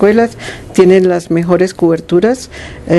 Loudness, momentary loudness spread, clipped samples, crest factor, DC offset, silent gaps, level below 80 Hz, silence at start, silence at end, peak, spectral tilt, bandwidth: -11 LUFS; 15 LU; 0.4%; 10 dB; under 0.1%; none; -40 dBFS; 0 s; 0 s; 0 dBFS; -6.5 dB/octave; 12 kHz